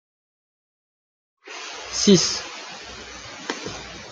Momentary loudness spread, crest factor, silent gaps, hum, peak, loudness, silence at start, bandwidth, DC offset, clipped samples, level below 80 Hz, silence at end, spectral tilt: 20 LU; 24 dB; none; none; -2 dBFS; -22 LUFS; 1.45 s; 9.6 kHz; under 0.1%; under 0.1%; -54 dBFS; 0 s; -3.5 dB/octave